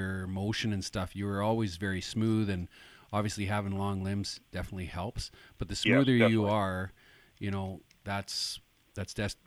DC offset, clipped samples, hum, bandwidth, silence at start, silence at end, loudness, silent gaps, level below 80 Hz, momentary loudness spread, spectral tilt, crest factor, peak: under 0.1%; under 0.1%; none; 15.5 kHz; 0 s; 0.15 s; -32 LUFS; none; -54 dBFS; 16 LU; -5.5 dB/octave; 22 dB; -12 dBFS